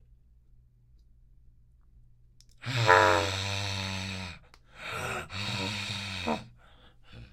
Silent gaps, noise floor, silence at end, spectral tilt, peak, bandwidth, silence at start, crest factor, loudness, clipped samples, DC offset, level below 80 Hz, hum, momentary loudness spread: none; -59 dBFS; 0.05 s; -4 dB/octave; -4 dBFS; 16 kHz; 2.6 s; 30 dB; -29 LUFS; under 0.1%; under 0.1%; -58 dBFS; none; 19 LU